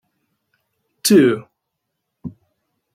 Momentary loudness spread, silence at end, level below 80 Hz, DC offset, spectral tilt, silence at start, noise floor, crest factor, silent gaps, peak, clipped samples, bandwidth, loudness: 23 LU; 0.65 s; -64 dBFS; under 0.1%; -4.5 dB/octave; 1.05 s; -77 dBFS; 18 dB; none; -2 dBFS; under 0.1%; 16.5 kHz; -15 LUFS